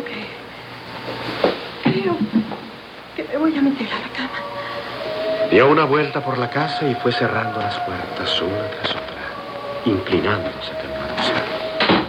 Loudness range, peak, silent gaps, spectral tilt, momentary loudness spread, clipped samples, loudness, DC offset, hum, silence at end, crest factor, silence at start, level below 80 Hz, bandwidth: 5 LU; -2 dBFS; none; -6 dB/octave; 13 LU; under 0.1%; -21 LUFS; under 0.1%; none; 0 s; 20 dB; 0 s; -52 dBFS; 16 kHz